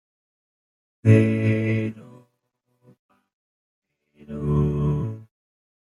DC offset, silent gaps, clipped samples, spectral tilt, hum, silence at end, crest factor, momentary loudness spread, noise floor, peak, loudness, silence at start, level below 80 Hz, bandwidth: under 0.1%; 2.99-3.09 s, 3.33-3.82 s; under 0.1%; -9.5 dB/octave; none; 0.75 s; 22 dB; 18 LU; -74 dBFS; -4 dBFS; -22 LUFS; 1.05 s; -44 dBFS; 11 kHz